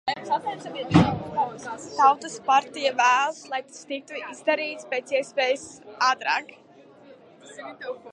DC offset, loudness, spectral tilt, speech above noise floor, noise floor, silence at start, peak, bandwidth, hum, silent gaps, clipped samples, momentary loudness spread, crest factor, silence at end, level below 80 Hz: under 0.1%; -24 LUFS; -4.5 dB/octave; 25 dB; -50 dBFS; 0.05 s; -2 dBFS; 11 kHz; none; none; under 0.1%; 16 LU; 24 dB; 0 s; -54 dBFS